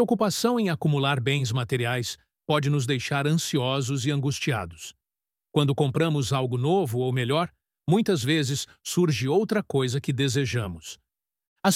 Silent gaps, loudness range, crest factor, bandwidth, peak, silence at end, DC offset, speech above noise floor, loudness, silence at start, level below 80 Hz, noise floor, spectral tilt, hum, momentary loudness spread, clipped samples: 11.47-11.56 s; 2 LU; 20 dB; 16 kHz; -6 dBFS; 0 s; under 0.1%; over 65 dB; -25 LUFS; 0 s; -60 dBFS; under -90 dBFS; -5.5 dB/octave; none; 7 LU; under 0.1%